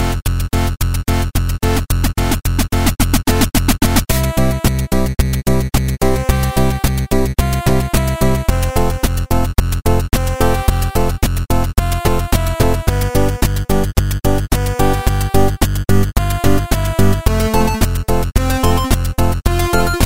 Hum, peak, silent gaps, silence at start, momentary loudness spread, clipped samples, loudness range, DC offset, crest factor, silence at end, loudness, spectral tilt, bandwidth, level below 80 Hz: none; 0 dBFS; none; 0 s; 3 LU; under 0.1%; 1 LU; 3%; 14 dB; 0 s; -16 LUFS; -5.5 dB/octave; 16.5 kHz; -18 dBFS